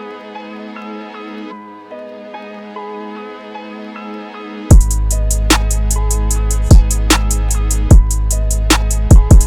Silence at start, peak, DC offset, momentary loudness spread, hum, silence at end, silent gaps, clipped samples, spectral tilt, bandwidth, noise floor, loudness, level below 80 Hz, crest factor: 0 s; 0 dBFS; under 0.1%; 19 LU; none; 0 s; none; 1%; -4.5 dB/octave; 16.5 kHz; -31 dBFS; -13 LUFS; -14 dBFS; 12 dB